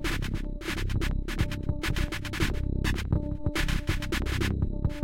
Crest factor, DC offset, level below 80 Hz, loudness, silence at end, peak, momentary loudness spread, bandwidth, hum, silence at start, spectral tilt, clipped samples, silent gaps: 14 dB; under 0.1%; -32 dBFS; -31 LUFS; 0 s; -14 dBFS; 4 LU; 16.5 kHz; none; 0 s; -5.5 dB/octave; under 0.1%; none